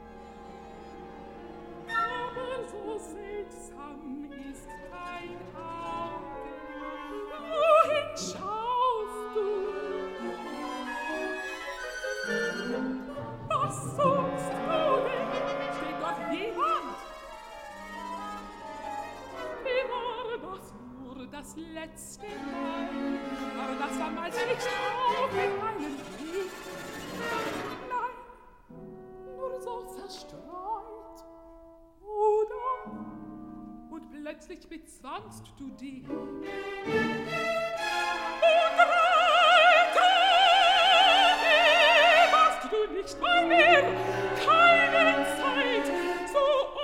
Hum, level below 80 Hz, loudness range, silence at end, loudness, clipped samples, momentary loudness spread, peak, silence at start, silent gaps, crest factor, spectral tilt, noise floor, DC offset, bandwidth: none; -58 dBFS; 19 LU; 0 s; -26 LUFS; under 0.1%; 24 LU; -6 dBFS; 0 s; none; 22 dB; -3 dB/octave; -53 dBFS; under 0.1%; 16 kHz